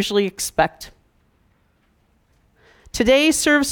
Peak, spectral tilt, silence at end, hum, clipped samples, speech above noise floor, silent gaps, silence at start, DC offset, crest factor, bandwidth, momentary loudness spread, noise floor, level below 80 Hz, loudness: -4 dBFS; -3 dB/octave; 0 s; none; under 0.1%; 43 dB; none; 0 s; under 0.1%; 18 dB; 19.5 kHz; 21 LU; -62 dBFS; -46 dBFS; -18 LUFS